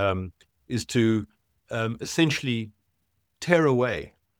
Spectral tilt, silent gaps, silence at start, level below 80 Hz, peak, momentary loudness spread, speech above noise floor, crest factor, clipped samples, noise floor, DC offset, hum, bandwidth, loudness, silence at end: -5.5 dB/octave; none; 0 s; -58 dBFS; -4 dBFS; 14 LU; 50 dB; 22 dB; under 0.1%; -75 dBFS; under 0.1%; none; 16.5 kHz; -26 LUFS; 0.3 s